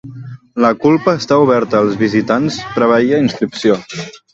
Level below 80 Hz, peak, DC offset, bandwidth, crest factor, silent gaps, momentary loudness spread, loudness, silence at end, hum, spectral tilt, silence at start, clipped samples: -52 dBFS; 0 dBFS; under 0.1%; 8 kHz; 14 dB; none; 15 LU; -13 LUFS; 0.2 s; none; -6 dB/octave; 0.05 s; under 0.1%